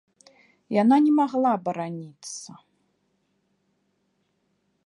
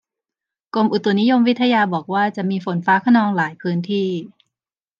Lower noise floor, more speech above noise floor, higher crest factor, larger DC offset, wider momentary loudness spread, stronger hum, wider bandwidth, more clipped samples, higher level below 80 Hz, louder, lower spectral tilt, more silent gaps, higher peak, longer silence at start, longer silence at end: second, -72 dBFS vs -89 dBFS; second, 50 dB vs 71 dB; about the same, 18 dB vs 16 dB; neither; first, 18 LU vs 8 LU; neither; first, 11.5 kHz vs 7.2 kHz; neither; second, -80 dBFS vs -72 dBFS; second, -22 LUFS vs -18 LUFS; second, -6 dB/octave vs -7.5 dB/octave; neither; second, -8 dBFS vs -4 dBFS; about the same, 0.7 s vs 0.75 s; first, 2.4 s vs 0.75 s